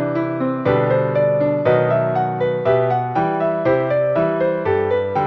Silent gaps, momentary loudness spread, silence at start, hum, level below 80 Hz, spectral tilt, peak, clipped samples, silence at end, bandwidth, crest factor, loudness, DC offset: none; 3 LU; 0 s; none; -52 dBFS; -9.5 dB/octave; -4 dBFS; under 0.1%; 0 s; 6 kHz; 14 dB; -18 LUFS; under 0.1%